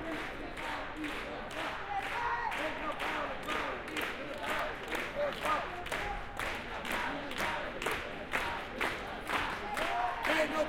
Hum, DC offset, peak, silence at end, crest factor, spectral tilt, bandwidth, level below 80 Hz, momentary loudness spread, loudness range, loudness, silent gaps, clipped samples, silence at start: none; under 0.1%; -18 dBFS; 0 s; 18 dB; -3.5 dB/octave; 16.5 kHz; -52 dBFS; 6 LU; 1 LU; -36 LUFS; none; under 0.1%; 0 s